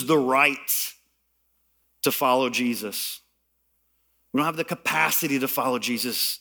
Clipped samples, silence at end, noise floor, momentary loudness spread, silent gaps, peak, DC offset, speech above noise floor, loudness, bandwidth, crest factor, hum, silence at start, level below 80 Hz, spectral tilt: under 0.1%; 0.05 s; -71 dBFS; 9 LU; none; -6 dBFS; under 0.1%; 47 dB; -23 LUFS; over 20 kHz; 20 dB; none; 0 s; -72 dBFS; -3 dB/octave